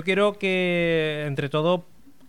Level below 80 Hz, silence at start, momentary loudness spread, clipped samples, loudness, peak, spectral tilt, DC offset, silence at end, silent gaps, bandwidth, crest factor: -58 dBFS; 0 s; 5 LU; under 0.1%; -23 LUFS; -8 dBFS; -6.5 dB/octave; 0.4%; 0.5 s; none; 14 kHz; 16 dB